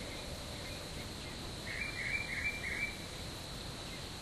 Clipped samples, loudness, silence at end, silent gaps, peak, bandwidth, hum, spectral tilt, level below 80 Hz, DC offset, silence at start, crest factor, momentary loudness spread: under 0.1%; -40 LUFS; 0 s; none; -24 dBFS; 15.5 kHz; none; -3 dB/octave; -52 dBFS; under 0.1%; 0 s; 18 dB; 7 LU